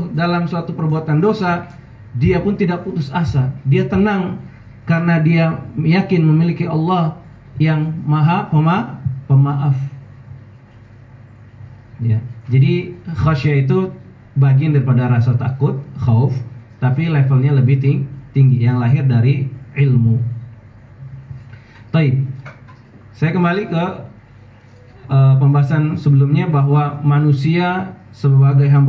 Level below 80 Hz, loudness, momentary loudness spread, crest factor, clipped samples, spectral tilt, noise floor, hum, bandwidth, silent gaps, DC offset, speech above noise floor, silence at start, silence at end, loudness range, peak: -42 dBFS; -16 LUFS; 12 LU; 12 dB; under 0.1%; -10 dB/octave; -42 dBFS; none; 5.8 kHz; none; under 0.1%; 28 dB; 0 s; 0 s; 6 LU; -4 dBFS